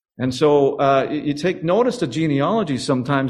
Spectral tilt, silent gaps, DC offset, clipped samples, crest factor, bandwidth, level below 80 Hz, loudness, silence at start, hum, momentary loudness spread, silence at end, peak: -6.5 dB/octave; none; under 0.1%; under 0.1%; 16 dB; 12 kHz; -54 dBFS; -19 LUFS; 0.2 s; none; 6 LU; 0 s; -4 dBFS